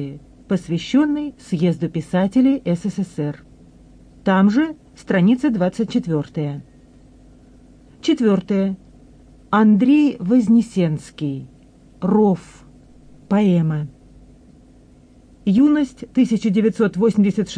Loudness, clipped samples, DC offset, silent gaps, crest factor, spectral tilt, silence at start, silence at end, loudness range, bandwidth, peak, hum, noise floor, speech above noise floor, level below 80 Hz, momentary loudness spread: -19 LUFS; under 0.1%; under 0.1%; none; 12 dB; -7.5 dB/octave; 0 s; 0 s; 5 LU; 10 kHz; -6 dBFS; none; -48 dBFS; 31 dB; -52 dBFS; 12 LU